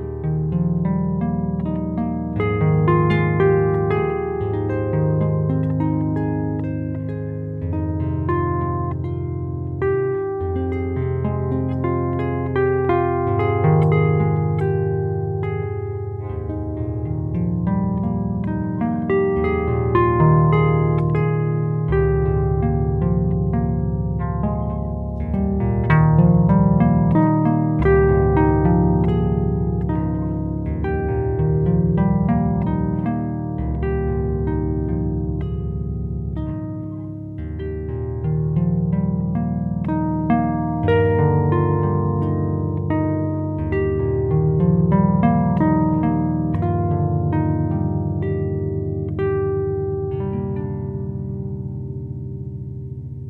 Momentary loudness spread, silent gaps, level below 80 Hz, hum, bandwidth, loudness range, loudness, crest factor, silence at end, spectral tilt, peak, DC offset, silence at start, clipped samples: 10 LU; none; -32 dBFS; none; 3.9 kHz; 6 LU; -20 LUFS; 18 dB; 0 s; -12 dB/octave; -2 dBFS; under 0.1%; 0 s; under 0.1%